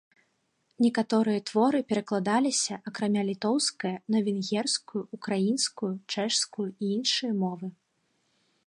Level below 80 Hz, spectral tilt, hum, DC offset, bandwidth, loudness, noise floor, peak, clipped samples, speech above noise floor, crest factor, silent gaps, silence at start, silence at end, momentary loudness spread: -78 dBFS; -4 dB/octave; none; under 0.1%; 11.5 kHz; -28 LUFS; -74 dBFS; -12 dBFS; under 0.1%; 46 dB; 18 dB; none; 0.8 s; 0.95 s; 7 LU